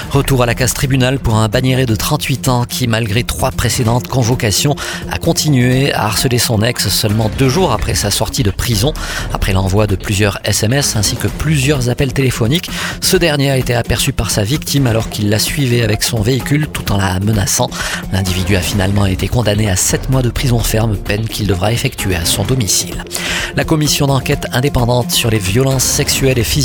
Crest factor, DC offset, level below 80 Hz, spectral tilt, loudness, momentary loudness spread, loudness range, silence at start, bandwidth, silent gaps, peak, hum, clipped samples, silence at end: 14 dB; under 0.1%; -26 dBFS; -4.5 dB/octave; -14 LUFS; 4 LU; 2 LU; 0 s; 19.5 kHz; none; 0 dBFS; none; under 0.1%; 0 s